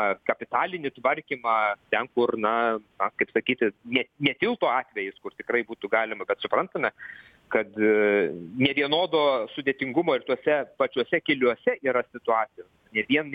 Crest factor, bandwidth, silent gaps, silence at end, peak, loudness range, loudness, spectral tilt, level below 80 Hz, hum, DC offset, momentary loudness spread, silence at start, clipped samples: 20 dB; 5 kHz; none; 0 s; -6 dBFS; 3 LU; -26 LUFS; -7.5 dB/octave; -68 dBFS; none; under 0.1%; 7 LU; 0 s; under 0.1%